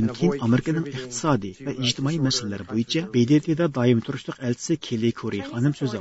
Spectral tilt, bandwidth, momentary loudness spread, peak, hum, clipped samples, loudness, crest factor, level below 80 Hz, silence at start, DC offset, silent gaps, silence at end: -5.5 dB/octave; 8 kHz; 9 LU; -6 dBFS; none; under 0.1%; -24 LUFS; 16 dB; -56 dBFS; 0 s; under 0.1%; none; 0 s